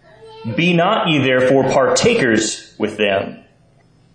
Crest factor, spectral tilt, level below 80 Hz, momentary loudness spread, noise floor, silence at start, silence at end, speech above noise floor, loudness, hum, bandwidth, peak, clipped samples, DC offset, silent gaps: 14 dB; -4.5 dB/octave; -52 dBFS; 10 LU; -52 dBFS; 0.25 s; 0.8 s; 37 dB; -15 LUFS; none; 10 kHz; -2 dBFS; under 0.1%; under 0.1%; none